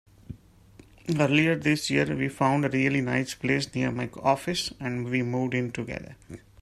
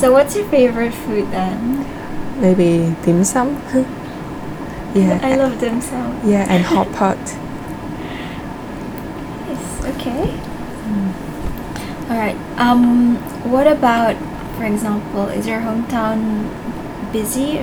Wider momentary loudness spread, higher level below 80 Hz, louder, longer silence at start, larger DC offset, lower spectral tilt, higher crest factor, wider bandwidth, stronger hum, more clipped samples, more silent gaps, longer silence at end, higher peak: first, 21 LU vs 14 LU; second, -56 dBFS vs -36 dBFS; second, -26 LUFS vs -18 LUFS; first, 0.3 s vs 0 s; neither; about the same, -5.5 dB/octave vs -6 dB/octave; about the same, 20 dB vs 18 dB; second, 14.5 kHz vs over 20 kHz; neither; neither; neither; first, 0.25 s vs 0 s; second, -8 dBFS vs 0 dBFS